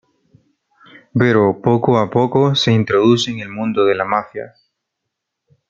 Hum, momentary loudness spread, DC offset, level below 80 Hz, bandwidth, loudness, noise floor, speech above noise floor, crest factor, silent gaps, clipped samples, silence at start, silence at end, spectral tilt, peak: none; 10 LU; under 0.1%; -56 dBFS; 7.8 kHz; -15 LUFS; -78 dBFS; 63 dB; 16 dB; none; under 0.1%; 1.15 s; 1.2 s; -6 dB/octave; 0 dBFS